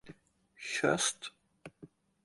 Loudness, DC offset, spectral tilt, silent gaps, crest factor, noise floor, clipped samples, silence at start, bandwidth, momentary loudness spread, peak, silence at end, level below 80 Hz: -33 LUFS; under 0.1%; -2.5 dB/octave; none; 22 dB; -63 dBFS; under 0.1%; 0.05 s; 11.5 kHz; 25 LU; -16 dBFS; 0.4 s; -74 dBFS